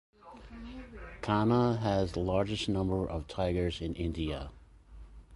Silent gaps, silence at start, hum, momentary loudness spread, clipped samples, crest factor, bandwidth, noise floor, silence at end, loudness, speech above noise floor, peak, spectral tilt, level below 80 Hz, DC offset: none; 0.25 s; none; 19 LU; under 0.1%; 18 dB; 11.5 kHz; -52 dBFS; 0 s; -32 LUFS; 21 dB; -14 dBFS; -7 dB/octave; -46 dBFS; under 0.1%